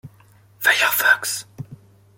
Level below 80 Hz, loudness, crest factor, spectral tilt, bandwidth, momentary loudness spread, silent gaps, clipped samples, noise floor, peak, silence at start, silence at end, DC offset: -66 dBFS; -18 LUFS; 20 dB; -0.5 dB/octave; 17 kHz; 23 LU; none; under 0.1%; -52 dBFS; -2 dBFS; 0.05 s; 0.4 s; under 0.1%